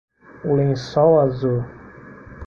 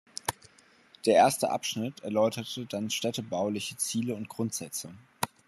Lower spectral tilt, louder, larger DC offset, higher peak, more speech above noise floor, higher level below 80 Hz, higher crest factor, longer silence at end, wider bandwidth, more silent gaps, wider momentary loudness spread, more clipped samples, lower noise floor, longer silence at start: first, -8.5 dB/octave vs -3.5 dB/octave; first, -19 LUFS vs -30 LUFS; neither; first, -4 dBFS vs -10 dBFS; second, 23 dB vs 30 dB; first, -48 dBFS vs -72 dBFS; about the same, 16 dB vs 20 dB; second, 0 s vs 0.2 s; second, 7 kHz vs 13.5 kHz; neither; about the same, 13 LU vs 13 LU; neither; second, -41 dBFS vs -59 dBFS; first, 0.45 s vs 0.25 s